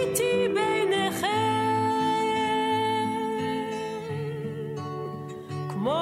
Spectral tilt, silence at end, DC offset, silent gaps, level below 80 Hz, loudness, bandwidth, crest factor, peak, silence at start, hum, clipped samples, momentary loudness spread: -4.5 dB/octave; 0 s; under 0.1%; none; -64 dBFS; -27 LUFS; 16 kHz; 14 dB; -14 dBFS; 0 s; none; under 0.1%; 10 LU